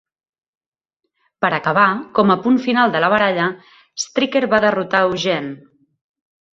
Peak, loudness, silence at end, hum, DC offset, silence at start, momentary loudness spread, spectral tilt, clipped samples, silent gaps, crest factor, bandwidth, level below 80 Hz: -2 dBFS; -17 LUFS; 1 s; none; under 0.1%; 1.4 s; 9 LU; -4.5 dB/octave; under 0.1%; none; 18 dB; 7.8 kHz; -60 dBFS